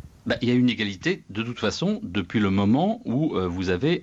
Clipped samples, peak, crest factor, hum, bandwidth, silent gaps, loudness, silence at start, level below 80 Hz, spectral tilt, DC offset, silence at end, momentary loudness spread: under 0.1%; -12 dBFS; 12 dB; none; 8 kHz; none; -24 LUFS; 0.05 s; -54 dBFS; -6.5 dB/octave; under 0.1%; 0 s; 7 LU